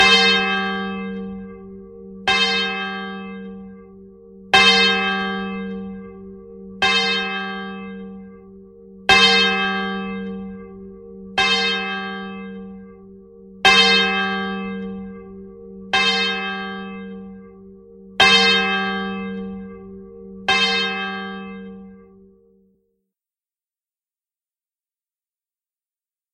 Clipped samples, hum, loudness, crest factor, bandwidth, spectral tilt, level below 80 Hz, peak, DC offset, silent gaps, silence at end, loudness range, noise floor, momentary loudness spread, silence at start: under 0.1%; none; -17 LUFS; 22 dB; 13 kHz; -3 dB/octave; -52 dBFS; 0 dBFS; under 0.1%; none; 4.35 s; 6 LU; under -90 dBFS; 26 LU; 0 s